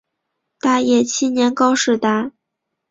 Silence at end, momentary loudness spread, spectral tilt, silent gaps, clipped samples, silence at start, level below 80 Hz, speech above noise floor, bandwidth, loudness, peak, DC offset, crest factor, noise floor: 0.6 s; 7 LU; -3 dB/octave; none; under 0.1%; 0.65 s; -62 dBFS; 62 dB; 7.8 kHz; -17 LUFS; -2 dBFS; under 0.1%; 16 dB; -78 dBFS